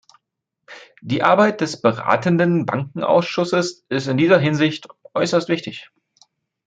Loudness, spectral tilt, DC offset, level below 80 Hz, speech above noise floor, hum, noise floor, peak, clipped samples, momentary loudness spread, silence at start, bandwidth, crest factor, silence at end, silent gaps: -19 LUFS; -6 dB/octave; under 0.1%; -64 dBFS; 60 dB; none; -78 dBFS; -2 dBFS; under 0.1%; 10 LU; 0.7 s; 9.2 kHz; 18 dB; 0.85 s; none